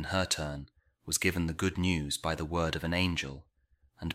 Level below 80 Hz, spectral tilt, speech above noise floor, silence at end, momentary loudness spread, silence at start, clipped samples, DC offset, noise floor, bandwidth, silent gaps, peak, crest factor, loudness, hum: -48 dBFS; -4 dB/octave; 37 dB; 0 s; 12 LU; 0 s; under 0.1%; under 0.1%; -69 dBFS; 16 kHz; none; -12 dBFS; 20 dB; -32 LUFS; none